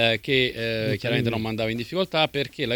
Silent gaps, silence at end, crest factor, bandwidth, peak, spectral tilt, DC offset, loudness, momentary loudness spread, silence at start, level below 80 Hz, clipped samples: none; 0 s; 18 dB; 19.5 kHz; -6 dBFS; -6 dB/octave; under 0.1%; -24 LUFS; 5 LU; 0 s; -52 dBFS; under 0.1%